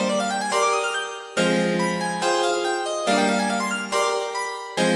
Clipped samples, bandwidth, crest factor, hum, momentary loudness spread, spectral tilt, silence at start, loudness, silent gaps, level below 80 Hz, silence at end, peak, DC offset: under 0.1%; 11.5 kHz; 16 dB; none; 6 LU; -3.5 dB/octave; 0 s; -23 LUFS; none; -70 dBFS; 0 s; -6 dBFS; under 0.1%